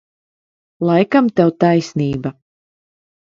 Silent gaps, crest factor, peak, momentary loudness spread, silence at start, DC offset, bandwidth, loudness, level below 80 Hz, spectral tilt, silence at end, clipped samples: none; 18 dB; 0 dBFS; 10 LU; 0.8 s; under 0.1%; 7.6 kHz; -16 LUFS; -54 dBFS; -7.5 dB/octave; 0.95 s; under 0.1%